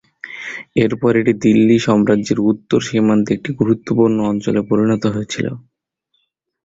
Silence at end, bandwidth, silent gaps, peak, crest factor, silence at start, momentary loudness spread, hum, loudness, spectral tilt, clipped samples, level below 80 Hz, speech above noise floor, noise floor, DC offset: 1.05 s; 7.8 kHz; none; 0 dBFS; 16 dB; 0.25 s; 11 LU; none; -16 LUFS; -6.5 dB/octave; under 0.1%; -50 dBFS; 53 dB; -68 dBFS; under 0.1%